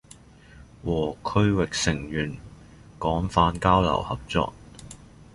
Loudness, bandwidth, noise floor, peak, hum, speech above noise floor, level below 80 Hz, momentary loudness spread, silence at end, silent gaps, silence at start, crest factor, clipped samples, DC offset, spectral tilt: -25 LUFS; 11.5 kHz; -50 dBFS; -4 dBFS; none; 26 dB; -40 dBFS; 23 LU; 0.3 s; none; 0.55 s; 22 dB; under 0.1%; under 0.1%; -5.5 dB/octave